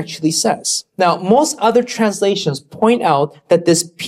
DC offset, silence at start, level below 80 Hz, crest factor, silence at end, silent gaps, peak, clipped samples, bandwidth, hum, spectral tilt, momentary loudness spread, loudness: under 0.1%; 0 s; -60 dBFS; 14 dB; 0 s; none; -2 dBFS; under 0.1%; 15.5 kHz; none; -4 dB/octave; 5 LU; -15 LUFS